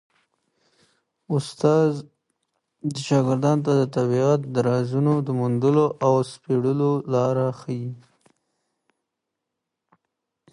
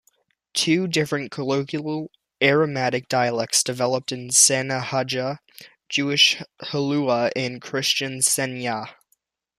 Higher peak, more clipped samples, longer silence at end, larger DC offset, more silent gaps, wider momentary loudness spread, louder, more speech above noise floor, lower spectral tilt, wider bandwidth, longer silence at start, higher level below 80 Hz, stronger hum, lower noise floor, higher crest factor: second, -6 dBFS vs -2 dBFS; neither; first, 2.55 s vs 0.7 s; neither; neither; about the same, 10 LU vs 12 LU; about the same, -22 LUFS vs -21 LUFS; first, 61 dB vs 47 dB; first, -7.5 dB/octave vs -2.5 dB/octave; second, 11.5 kHz vs 15 kHz; first, 1.3 s vs 0.55 s; about the same, -68 dBFS vs -66 dBFS; neither; first, -83 dBFS vs -69 dBFS; about the same, 18 dB vs 20 dB